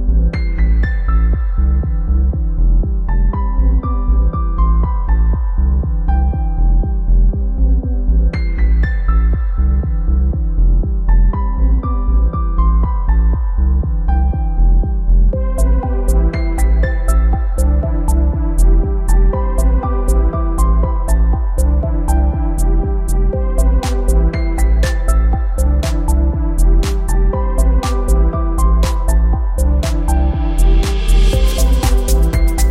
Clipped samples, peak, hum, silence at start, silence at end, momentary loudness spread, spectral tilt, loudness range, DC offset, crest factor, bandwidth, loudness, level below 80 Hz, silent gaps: under 0.1%; -2 dBFS; none; 0 s; 0 s; 3 LU; -6.5 dB/octave; 1 LU; under 0.1%; 10 dB; 13.5 kHz; -16 LUFS; -12 dBFS; none